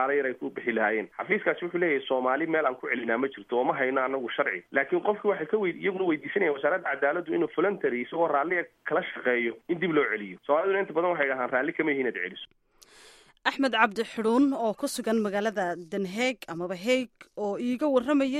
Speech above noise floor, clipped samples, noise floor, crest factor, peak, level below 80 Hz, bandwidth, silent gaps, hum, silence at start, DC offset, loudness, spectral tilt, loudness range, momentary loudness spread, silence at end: 28 dB; under 0.1%; -55 dBFS; 22 dB; -6 dBFS; -74 dBFS; 14.5 kHz; none; none; 0 s; under 0.1%; -27 LUFS; -5 dB/octave; 1 LU; 6 LU; 0 s